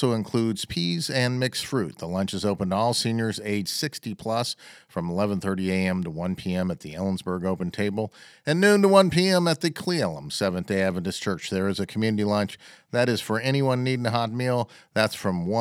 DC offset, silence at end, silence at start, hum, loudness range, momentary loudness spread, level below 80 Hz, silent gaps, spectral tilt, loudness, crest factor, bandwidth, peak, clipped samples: under 0.1%; 0 s; 0 s; none; 5 LU; 9 LU; -58 dBFS; none; -5.5 dB/octave; -25 LUFS; 22 dB; 16 kHz; -4 dBFS; under 0.1%